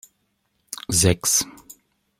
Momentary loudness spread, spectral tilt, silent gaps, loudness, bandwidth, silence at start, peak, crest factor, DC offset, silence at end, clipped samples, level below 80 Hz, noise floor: 17 LU; -3 dB/octave; none; -19 LUFS; 16.5 kHz; 0.9 s; -4 dBFS; 22 dB; under 0.1%; 0.45 s; under 0.1%; -48 dBFS; -71 dBFS